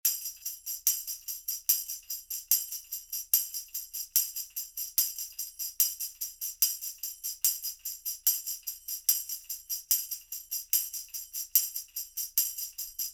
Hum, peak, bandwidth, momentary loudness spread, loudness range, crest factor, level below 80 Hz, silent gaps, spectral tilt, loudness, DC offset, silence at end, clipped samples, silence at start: none; -6 dBFS; over 20 kHz; 9 LU; 1 LU; 28 dB; -70 dBFS; none; 5.5 dB/octave; -30 LUFS; under 0.1%; 0 s; under 0.1%; 0.05 s